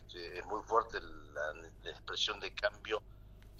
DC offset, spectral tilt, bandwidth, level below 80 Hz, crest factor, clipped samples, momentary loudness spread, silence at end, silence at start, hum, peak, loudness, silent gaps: under 0.1%; -2.5 dB/octave; 14 kHz; -58 dBFS; 24 dB; under 0.1%; 14 LU; 0 s; 0 s; none; -16 dBFS; -39 LUFS; none